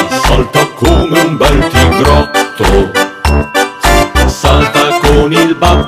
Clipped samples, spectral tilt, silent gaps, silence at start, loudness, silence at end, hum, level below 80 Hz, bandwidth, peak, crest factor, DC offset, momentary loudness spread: 2%; -5 dB/octave; none; 0 s; -9 LUFS; 0 s; none; -14 dBFS; 16 kHz; 0 dBFS; 8 dB; under 0.1%; 4 LU